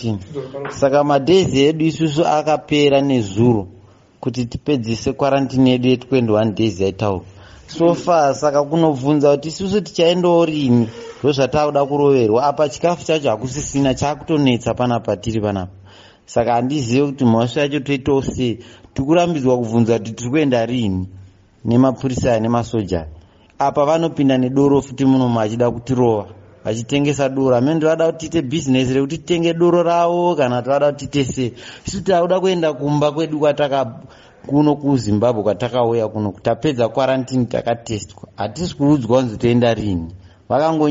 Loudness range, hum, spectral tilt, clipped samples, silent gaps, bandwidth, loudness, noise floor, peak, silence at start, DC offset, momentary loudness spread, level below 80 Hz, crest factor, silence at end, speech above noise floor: 3 LU; none; -6 dB/octave; under 0.1%; none; 8 kHz; -17 LUFS; -44 dBFS; -2 dBFS; 0 s; under 0.1%; 9 LU; -46 dBFS; 14 dB; 0 s; 27 dB